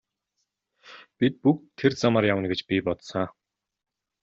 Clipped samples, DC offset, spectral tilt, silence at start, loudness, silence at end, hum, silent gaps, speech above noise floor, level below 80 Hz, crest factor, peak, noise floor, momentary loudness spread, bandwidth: under 0.1%; under 0.1%; -6.5 dB/octave; 0.9 s; -25 LUFS; 0.9 s; none; none; 55 dB; -64 dBFS; 20 dB; -8 dBFS; -79 dBFS; 9 LU; 7.8 kHz